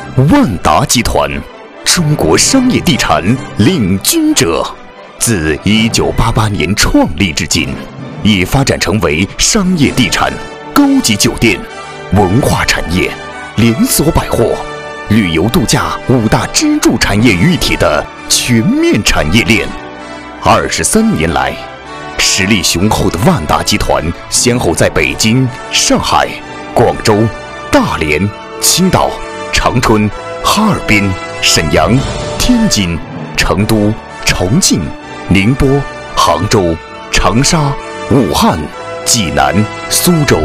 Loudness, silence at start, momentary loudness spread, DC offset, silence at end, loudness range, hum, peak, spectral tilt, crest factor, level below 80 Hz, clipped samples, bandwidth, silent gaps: -10 LUFS; 0 s; 8 LU; under 0.1%; 0 s; 2 LU; none; 0 dBFS; -4 dB/octave; 10 dB; -24 dBFS; 0.2%; 16 kHz; none